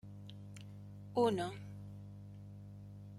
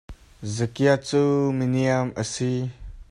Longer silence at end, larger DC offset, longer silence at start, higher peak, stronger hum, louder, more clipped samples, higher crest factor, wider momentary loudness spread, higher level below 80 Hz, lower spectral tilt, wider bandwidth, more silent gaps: about the same, 0 s vs 0.1 s; neither; about the same, 0.05 s vs 0.1 s; second, -20 dBFS vs -6 dBFS; first, 50 Hz at -50 dBFS vs none; second, -38 LUFS vs -23 LUFS; neither; about the same, 22 dB vs 18 dB; first, 19 LU vs 10 LU; second, -68 dBFS vs -48 dBFS; about the same, -6.5 dB/octave vs -6 dB/octave; first, 14 kHz vs 11 kHz; neither